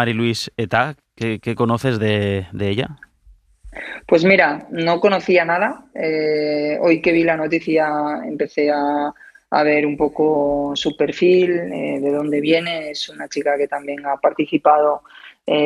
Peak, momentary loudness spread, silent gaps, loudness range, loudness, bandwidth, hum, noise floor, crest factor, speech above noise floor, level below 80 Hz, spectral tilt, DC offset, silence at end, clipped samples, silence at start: -2 dBFS; 10 LU; none; 3 LU; -18 LUFS; 12 kHz; none; -51 dBFS; 18 dB; 33 dB; -52 dBFS; -6 dB/octave; under 0.1%; 0 s; under 0.1%; 0 s